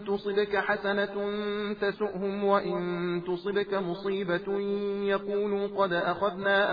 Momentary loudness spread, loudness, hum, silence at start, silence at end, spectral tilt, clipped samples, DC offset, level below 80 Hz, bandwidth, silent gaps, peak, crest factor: 5 LU; -29 LUFS; none; 0 s; 0 s; -8 dB/octave; under 0.1%; under 0.1%; -62 dBFS; 5 kHz; none; -12 dBFS; 16 dB